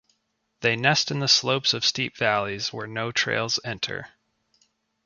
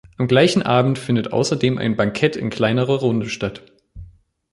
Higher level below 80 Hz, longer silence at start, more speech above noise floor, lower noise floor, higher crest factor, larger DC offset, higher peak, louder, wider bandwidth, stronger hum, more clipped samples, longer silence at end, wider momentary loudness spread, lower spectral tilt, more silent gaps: second, -62 dBFS vs -48 dBFS; first, 0.6 s vs 0.2 s; first, 49 dB vs 28 dB; first, -74 dBFS vs -46 dBFS; about the same, 22 dB vs 18 dB; neither; about the same, -4 dBFS vs -2 dBFS; second, -23 LUFS vs -19 LUFS; second, 7.4 kHz vs 11.5 kHz; neither; neither; first, 1 s vs 0.45 s; first, 10 LU vs 7 LU; second, -2.5 dB/octave vs -6 dB/octave; neither